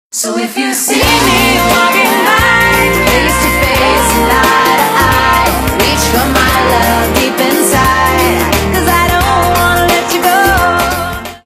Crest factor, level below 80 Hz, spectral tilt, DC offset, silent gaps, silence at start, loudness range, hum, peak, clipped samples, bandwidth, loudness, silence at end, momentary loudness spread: 10 dB; -22 dBFS; -3.5 dB/octave; under 0.1%; none; 0.15 s; 1 LU; none; 0 dBFS; 0.3%; over 20 kHz; -9 LUFS; 0.1 s; 4 LU